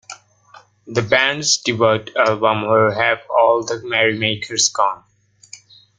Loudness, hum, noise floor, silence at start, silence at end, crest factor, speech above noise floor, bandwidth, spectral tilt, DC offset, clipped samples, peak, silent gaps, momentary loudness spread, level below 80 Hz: -17 LUFS; none; -48 dBFS; 0.1 s; 0.4 s; 18 dB; 31 dB; 10 kHz; -2.5 dB/octave; under 0.1%; under 0.1%; -2 dBFS; none; 5 LU; -58 dBFS